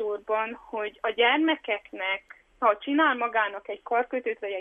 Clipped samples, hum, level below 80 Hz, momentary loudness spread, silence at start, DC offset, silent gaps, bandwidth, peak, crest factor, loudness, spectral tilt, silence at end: under 0.1%; none; -68 dBFS; 10 LU; 0 s; under 0.1%; none; 3.8 kHz; -10 dBFS; 16 dB; -26 LUFS; -5 dB/octave; 0 s